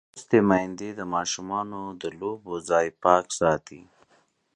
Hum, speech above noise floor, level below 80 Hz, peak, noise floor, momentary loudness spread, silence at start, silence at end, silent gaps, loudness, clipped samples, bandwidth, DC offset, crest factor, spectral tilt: none; 40 dB; -58 dBFS; -4 dBFS; -65 dBFS; 13 LU; 0.15 s; 0.75 s; none; -25 LUFS; under 0.1%; 11 kHz; under 0.1%; 22 dB; -4.5 dB/octave